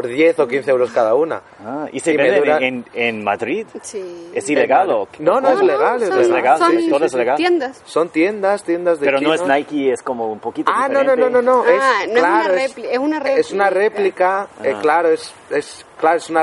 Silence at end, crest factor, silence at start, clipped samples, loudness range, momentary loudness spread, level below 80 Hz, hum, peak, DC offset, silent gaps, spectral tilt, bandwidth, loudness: 0 s; 16 dB; 0 s; under 0.1%; 3 LU; 10 LU; -66 dBFS; none; 0 dBFS; under 0.1%; none; -4.5 dB/octave; 11.5 kHz; -16 LUFS